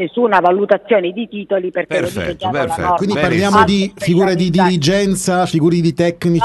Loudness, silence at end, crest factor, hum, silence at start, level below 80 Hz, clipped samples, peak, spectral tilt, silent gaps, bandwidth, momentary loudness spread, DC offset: -15 LUFS; 0 s; 14 dB; none; 0 s; -44 dBFS; under 0.1%; 0 dBFS; -5.5 dB/octave; none; 12.5 kHz; 7 LU; under 0.1%